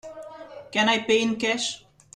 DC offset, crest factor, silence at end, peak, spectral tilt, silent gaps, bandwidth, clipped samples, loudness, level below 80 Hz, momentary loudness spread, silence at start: under 0.1%; 18 dB; 0.35 s; -10 dBFS; -2.5 dB/octave; none; 11.5 kHz; under 0.1%; -23 LUFS; -66 dBFS; 20 LU; 0.05 s